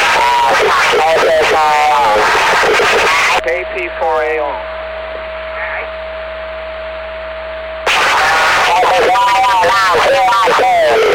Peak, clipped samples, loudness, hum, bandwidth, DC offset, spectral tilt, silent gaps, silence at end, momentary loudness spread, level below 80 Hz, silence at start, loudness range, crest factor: -8 dBFS; under 0.1%; -11 LUFS; none; over 20 kHz; 0.1%; -1.5 dB/octave; none; 0 s; 14 LU; -38 dBFS; 0 s; 10 LU; 4 dB